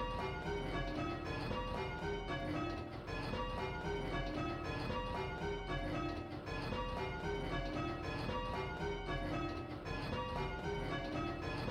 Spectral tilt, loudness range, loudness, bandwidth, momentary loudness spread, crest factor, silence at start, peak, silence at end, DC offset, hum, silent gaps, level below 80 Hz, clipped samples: -6.5 dB/octave; 0 LU; -41 LUFS; 13.5 kHz; 2 LU; 14 dB; 0 s; -28 dBFS; 0 s; under 0.1%; none; none; -50 dBFS; under 0.1%